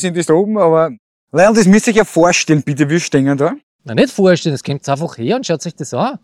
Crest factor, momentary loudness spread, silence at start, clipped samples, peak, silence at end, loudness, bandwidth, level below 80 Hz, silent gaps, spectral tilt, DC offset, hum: 14 dB; 10 LU; 0 s; under 0.1%; 0 dBFS; 0.05 s; -14 LUFS; 14 kHz; -50 dBFS; 0.99-1.27 s, 3.63-3.79 s; -5.5 dB/octave; under 0.1%; none